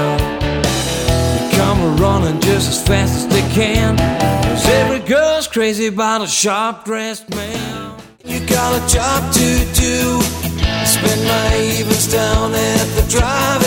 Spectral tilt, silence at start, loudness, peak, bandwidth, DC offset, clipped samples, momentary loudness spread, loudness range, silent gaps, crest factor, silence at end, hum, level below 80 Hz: -4 dB/octave; 0 s; -15 LUFS; 0 dBFS; 19 kHz; under 0.1%; under 0.1%; 8 LU; 3 LU; none; 14 dB; 0 s; none; -24 dBFS